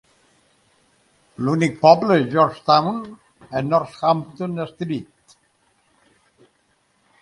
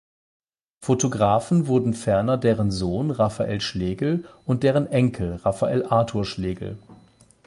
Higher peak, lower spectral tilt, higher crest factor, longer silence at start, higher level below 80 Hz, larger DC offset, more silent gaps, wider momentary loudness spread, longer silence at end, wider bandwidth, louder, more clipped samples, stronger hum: first, 0 dBFS vs -6 dBFS; about the same, -6.5 dB/octave vs -6.5 dB/octave; about the same, 22 dB vs 18 dB; first, 1.4 s vs 0.8 s; second, -62 dBFS vs -46 dBFS; neither; neither; first, 14 LU vs 8 LU; first, 2.2 s vs 0.5 s; about the same, 11 kHz vs 11.5 kHz; first, -19 LUFS vs -23 LUFS; neither; neither